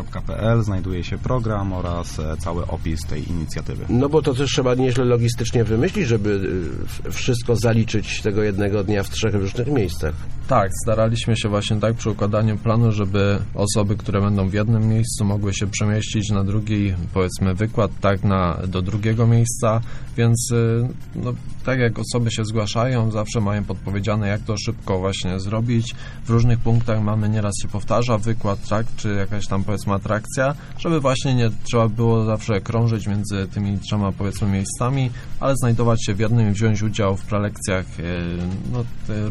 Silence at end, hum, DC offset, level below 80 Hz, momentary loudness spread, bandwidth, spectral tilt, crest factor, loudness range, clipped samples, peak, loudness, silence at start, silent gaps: 0 s; none; under 0.1%; -34 dBFS; 8 LU; 12.5 kHz; -6 dB/octave; 16 dB; 3 LU; under 0.1%; -4 dBFS; -21 LUFS; 0 s; none